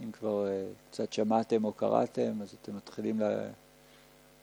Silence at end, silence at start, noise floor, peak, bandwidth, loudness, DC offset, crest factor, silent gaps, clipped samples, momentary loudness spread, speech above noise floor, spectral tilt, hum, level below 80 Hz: 0.9 s; 0 s; -59 dBFS; -14 dBFS; 20 kHz; -33 LUFS; under 0.1%; 20 dB; none; under 0.1%; 13 LU; 27 dB; -6.5 dB/octave; none; -74 dBFS